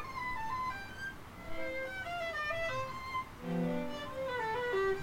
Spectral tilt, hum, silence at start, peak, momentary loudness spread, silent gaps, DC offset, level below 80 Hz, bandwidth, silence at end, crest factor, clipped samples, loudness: -5.5 dB/octave; none; 0 s; -24 dBFS; 8 LU; none; under 0.1%; -56 dBFS; 16 kHz; 0 s; 14 dB; under 0.1%; -38 LUFS